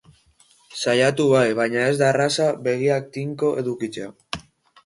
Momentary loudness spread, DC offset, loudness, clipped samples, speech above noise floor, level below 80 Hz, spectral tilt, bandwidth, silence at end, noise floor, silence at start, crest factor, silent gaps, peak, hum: 16 LU; under 0.1%; -21 LUFS; under 0.1%; 37 dB; -60 dBFS; -5 dB/octave; 11.5 kHz; 0.45 s; -57 dBFS; 0.7 s; 18 dB; none; -4 dBFS; none